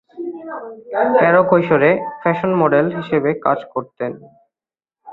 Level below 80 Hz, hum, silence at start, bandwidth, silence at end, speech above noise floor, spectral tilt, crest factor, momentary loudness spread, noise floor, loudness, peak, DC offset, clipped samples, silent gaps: -58 dBFS; none; 0.15 s; 4.3 kHz; 0 s; over 74 dB; -10 dB/octave; 16 dB; 17 LU; under -90 dBFS; -16 LUFS; -2 dBFS; under 0.1%; under 0.1%; none